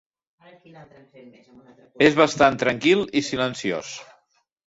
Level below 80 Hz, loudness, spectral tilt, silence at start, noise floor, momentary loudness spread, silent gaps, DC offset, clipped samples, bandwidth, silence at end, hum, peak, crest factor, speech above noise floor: -58 dBFS; -20 LUFS; -4.5 dB/octave; 0.75 s; -66 dBFS; 13 LU; none; under 0.1%; under 0.1%; 8 kHz; 0.65 s; none; -2 dBFS; 22 dB; 44 dB